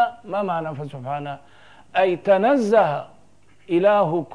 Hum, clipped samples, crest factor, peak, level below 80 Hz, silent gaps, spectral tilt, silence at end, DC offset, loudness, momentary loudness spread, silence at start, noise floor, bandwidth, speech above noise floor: none; under 0.1%; 16 dB; -6 dBFS; -66 dBFS; none; -7 dB/octave; 0 s; 0.3%; -21 LUFS; 14 LU; 0 s; -56 dBFS; 10.5 kHz; 36 dB